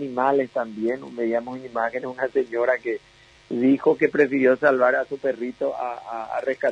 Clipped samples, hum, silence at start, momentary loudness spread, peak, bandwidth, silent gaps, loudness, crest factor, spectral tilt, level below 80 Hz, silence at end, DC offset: under 0.1%; none; 0 s; 12 LU; -6 dBFS; 8.6 kHz; none; -23 LUFS; 18 dB; -7 dB/octave; -66 dBFS; 0 s; under 0.1%